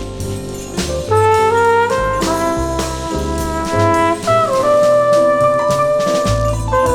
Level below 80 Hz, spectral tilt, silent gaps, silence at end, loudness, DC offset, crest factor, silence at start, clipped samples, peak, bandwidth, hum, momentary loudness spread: -30 dBFS; -5 dB/octave; none; 0 s; -15 LUFS; under 0.1%; 14 dB; 0 s; under 0.1%; 0 dBFS; 18.5 kHz; none; 9 LU